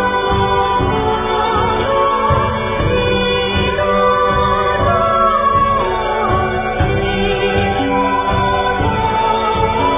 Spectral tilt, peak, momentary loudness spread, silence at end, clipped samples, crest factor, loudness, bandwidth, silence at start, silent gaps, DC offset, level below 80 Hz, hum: -10 dB/octave; -2 dBFS; 3 LU; 0 s; under 0.1%; 12 dB; -15 LUFS; 3.9 kHz; 0 s; none; under 0.1%; -28 dBFS; none